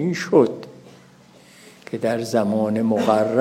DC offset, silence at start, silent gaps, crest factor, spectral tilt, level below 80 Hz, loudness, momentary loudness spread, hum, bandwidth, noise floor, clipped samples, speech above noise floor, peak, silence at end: under 0.1%; 0 s; none; 18 dB; -6.5 dB/octave; -70 dBFS; -20 LUFS; 15 LU; none; 15.5 kHz; -49 dBFS; under 0.1%; 30 dB; -4 dBFS; 0 s